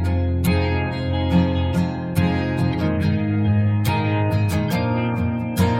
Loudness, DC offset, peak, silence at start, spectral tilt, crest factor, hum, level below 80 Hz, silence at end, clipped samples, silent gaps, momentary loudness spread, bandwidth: -21 LUFS; under 0.1%; -6 dBFS; 0 s; -7.5 dB/octave; 14 dB; none; -36 dBFS; 0 s; under 0.1%; none; 4 LU; 16.5 kHz